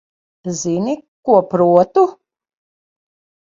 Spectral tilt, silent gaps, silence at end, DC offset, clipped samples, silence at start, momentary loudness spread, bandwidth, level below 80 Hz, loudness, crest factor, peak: -6.5 dB/octave; 1.08-1.23 s; 1.4 s; under 0.1%; under 0.1%; 0.45 s; 12 LU; 7.8 kHz; -62 dBFS; -16 LUFS; 18 dB; 0 dBFS